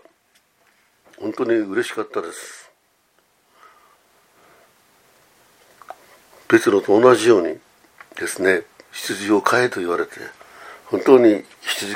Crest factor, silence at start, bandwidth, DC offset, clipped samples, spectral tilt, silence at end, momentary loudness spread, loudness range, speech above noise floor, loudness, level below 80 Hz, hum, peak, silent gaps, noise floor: 20 dB; 1.2 s; 16 kHz; under 0.1%; under 0.1%; -4.5 dB/octave; 0 s; 23 LU; 9 LU; 45 dB; -18 LUFS; -68 dBFS; none; 0 dBFS; none; -62 dBFS